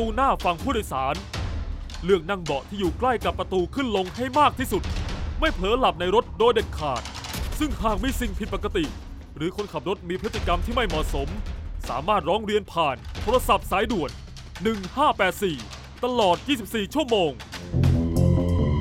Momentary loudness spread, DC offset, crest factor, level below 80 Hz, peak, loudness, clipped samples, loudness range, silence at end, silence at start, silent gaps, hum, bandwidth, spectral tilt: 10 LU; under 0.1%; 18 dB; -34 dBFS; -6 dBFS; -25 LUFS; under 0.1%; 5 LU; 0 s; 0 s; none; none; 16.5 kHz; -5.5 dB/octave